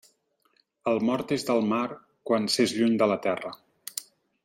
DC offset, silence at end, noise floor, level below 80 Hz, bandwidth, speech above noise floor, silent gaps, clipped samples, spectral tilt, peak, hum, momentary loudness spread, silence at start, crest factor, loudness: under 0.1%; 0.4 s; -69 dBFS; -72 dBFS; 16.5 kHz; 44 dB; none; under 0.1%; -4.5 dB/octave; -10 dBFS; none; 14 LU; 0.85 s; 18 dB; -27 LUFS